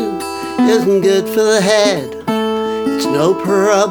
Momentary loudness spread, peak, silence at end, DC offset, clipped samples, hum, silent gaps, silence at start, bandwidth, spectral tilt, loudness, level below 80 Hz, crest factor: 8 LU; 0 dBFS; 0 s; 0.2%; under 0.1%; none; none; 0 s; over 20 kHz; -4.5 dB/octave; -14 LUFS; -60 dBFS; 14 dB